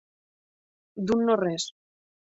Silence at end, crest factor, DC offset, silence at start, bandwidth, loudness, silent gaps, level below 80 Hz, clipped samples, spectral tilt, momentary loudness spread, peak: 0.6 s; 18 dB; under 0.1%; 0.95 s; 8 kHz; -27 LUFS; none; -64 dBFS; under 0.1%; -5 dB/octave; 12 LU; -10 dBFS